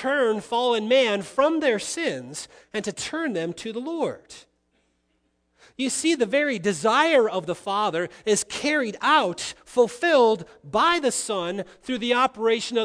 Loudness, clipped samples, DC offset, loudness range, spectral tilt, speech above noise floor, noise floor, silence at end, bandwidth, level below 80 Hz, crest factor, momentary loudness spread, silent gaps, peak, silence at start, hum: -23 LUFS; under 0.1%; under 0.1%; 8 LU; -3 dB/octave; 47 dB; -70 dBFS; 0 s; 11 kHz; -64 dBFS; 18 dB; 11 LU; none; -6 dBFS; 0 s; none